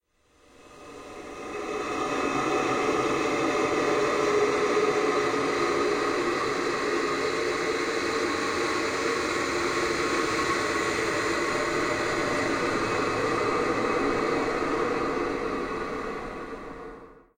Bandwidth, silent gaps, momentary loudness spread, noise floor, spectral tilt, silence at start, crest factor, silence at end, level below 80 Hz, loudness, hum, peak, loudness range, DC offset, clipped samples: 16 kHz; none; 10 LU; -62 dBFS; -3.5 dB/octave; 0.6 s; 14 dB; 0.25 s; -52 dBFS; -26 LUFS; none; -12 dBFS; 3 LU; under 0.1%; under 0.1%